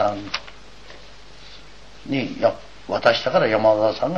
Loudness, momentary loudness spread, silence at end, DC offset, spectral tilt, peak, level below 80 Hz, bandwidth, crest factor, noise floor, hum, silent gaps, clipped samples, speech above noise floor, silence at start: -21 LUFS; 25 LU; 0 s; 0.9%; -5.5 dB/octave; -2 dBFS; -50 dBFS; 7.8 kHz; 20 dB; -45 dBFS; none; none; under 0.1%; 25 dB; 0 s